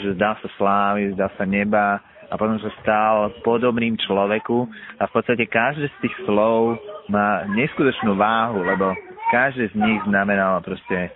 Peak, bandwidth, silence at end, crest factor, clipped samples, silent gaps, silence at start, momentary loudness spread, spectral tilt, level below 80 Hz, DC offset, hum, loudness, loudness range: -2 dBFS; 4 kHz; 0 s; 18 dB; under 0.1%; none; 0 s; 7 LU; -4 dB/octave; -54 dBFS; under 0.1%; none; -20 LUFS; 1 LU